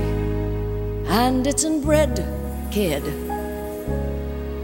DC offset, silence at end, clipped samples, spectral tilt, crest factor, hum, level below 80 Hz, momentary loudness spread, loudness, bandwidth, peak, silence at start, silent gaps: under 0.1%; 0 s; under 0.1%; -5 dB/octave; 18 dB; none; -30 dBFS; 10 LU; -23 LUFS; 18 kHz; -4 dBFS; 0 s; none